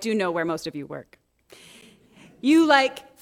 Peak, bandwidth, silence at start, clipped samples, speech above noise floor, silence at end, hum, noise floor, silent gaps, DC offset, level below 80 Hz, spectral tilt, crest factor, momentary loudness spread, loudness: -4 dBFS; 15 kHz; 0 s; under 0.1%; 31 dB; 0.2 s; none; -53 dBFS; none; under 0.1%; -68 dBFS; -4.5 dB/octave; 20 dB; 20 LU; -22 LUFS